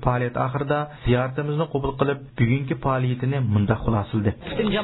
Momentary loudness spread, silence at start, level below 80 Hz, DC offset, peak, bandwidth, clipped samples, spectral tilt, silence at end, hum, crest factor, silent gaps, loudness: 3 LU; 0 s; -40 dBFS; under 0.1%; -6 dBFS; 4.1 kHz; under 0.1%; -12 dB/octave; 0 s; none; 16 dB; none; -24 LUFS